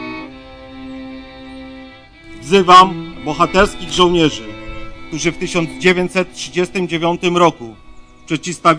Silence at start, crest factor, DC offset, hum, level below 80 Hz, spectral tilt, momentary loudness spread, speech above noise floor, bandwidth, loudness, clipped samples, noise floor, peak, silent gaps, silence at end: 0 s; 16 dB; under 0.1%; none; -38 dBFS; -4.5 dB/octave; 22 LU; 24 dB; 10.5 kHz; -14 LUFS; under 0.1%; -38 dBFS; 0 dBFS; none; 0 s